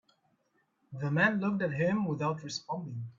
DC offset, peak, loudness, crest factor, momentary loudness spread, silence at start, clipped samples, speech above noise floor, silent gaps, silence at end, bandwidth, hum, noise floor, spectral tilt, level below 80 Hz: under 0.1%; -14 dBFS; -31 LUFS; 20 dB; 11 LU; 0.9 s; under 0.1%; 43 dB; none; 0.05 s; 7.6 kHz; none; -74 dBFS; -6 dB/octave; -70 dBFS